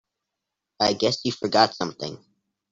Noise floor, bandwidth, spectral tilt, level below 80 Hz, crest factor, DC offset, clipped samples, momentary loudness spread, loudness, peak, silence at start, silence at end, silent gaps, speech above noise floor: -84 dBFS; 8 kHz; -4 dB/octave; -64 dBFS; 22 dB; under 0.1%; under 0.1%; 13 LU; -23 LUFS; -4 dBFS; 0.8 s; 0.55 s; none; 61 dB